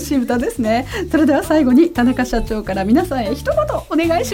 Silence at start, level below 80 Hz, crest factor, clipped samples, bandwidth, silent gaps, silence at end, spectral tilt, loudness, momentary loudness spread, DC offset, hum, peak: 0 s; -32 dBFS; 14 dB; under 0.1%; 17 kHz; none; 0 s; -5.5 dB/octave; -16 LUFS; 7 LU; under 0.1%; none; -2 dBFS